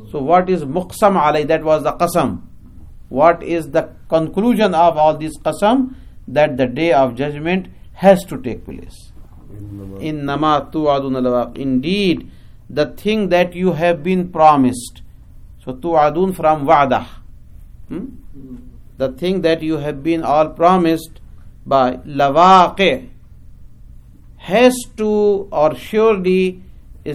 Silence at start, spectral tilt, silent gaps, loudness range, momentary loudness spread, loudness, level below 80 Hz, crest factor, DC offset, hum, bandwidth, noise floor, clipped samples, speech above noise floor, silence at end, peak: 0 s; -6 dB/octave; none; 5 LU; 16 LU; -16 LUFS; -40 dBFS; 16 dB; under 0.1%; none; 15.5 kHz; -39 dBFS; under 0.1%; 24 dB; 0 s; 0 dBFS